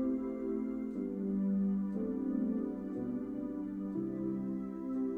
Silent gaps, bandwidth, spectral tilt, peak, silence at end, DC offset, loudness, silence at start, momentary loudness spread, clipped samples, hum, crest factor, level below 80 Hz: none; 2.9 kHz; -11.5 dB/octave; -24 dBFS; 0 s; under 0.1%; -37 LUFS; 0 s; 6 LU; under 0.1%; none; 12 dB; -62 dBFS